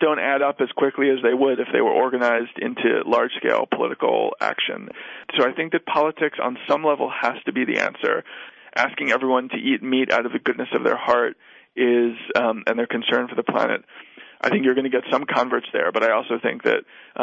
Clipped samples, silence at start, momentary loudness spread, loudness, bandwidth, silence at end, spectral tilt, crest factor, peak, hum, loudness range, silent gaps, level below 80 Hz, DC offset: under 0.1%; 0 s; 6 LU; -21 LUFS; 7.8 kHz; 0 s; -5.5 dB/octave; 16 dB; -6 dBFS; none; 2 LU; none; -70 dBFS; under 0.1%